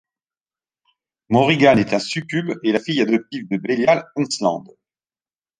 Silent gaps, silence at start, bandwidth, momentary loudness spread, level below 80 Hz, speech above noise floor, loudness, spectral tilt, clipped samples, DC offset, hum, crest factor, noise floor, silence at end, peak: none; 1.3 s; 10 kHz; 10 LU; -58 dBFS; over 72 dB; -19 LUFS; -5.5 dB/octave; under 0.1%; under 0.1%; none; 18 dB; under -90 dBFS; 1 s; -2 dBFS